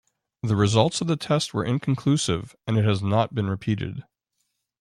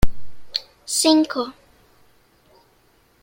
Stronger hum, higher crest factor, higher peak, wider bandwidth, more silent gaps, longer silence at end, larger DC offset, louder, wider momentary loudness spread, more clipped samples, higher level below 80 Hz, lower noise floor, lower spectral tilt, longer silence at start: neither; about the same, 20 dB vs 20 dB; about the same, -4 dBFS vs -2 dBFS; second, 11.5 kHz vs 16.5 kHz; neither; second, 0.8 s vs 1.7 s; neither; second, -24 LUFS vs -21 LUFS; second, 8 LU vs 12 LU; neither; second, -54 dBFS vs -34 dBFS; first, -76 dBFS vs -58 dBFS; first, -6 dB/octave vs -3.5 dB/octave; first, 0.45 s vs 0 s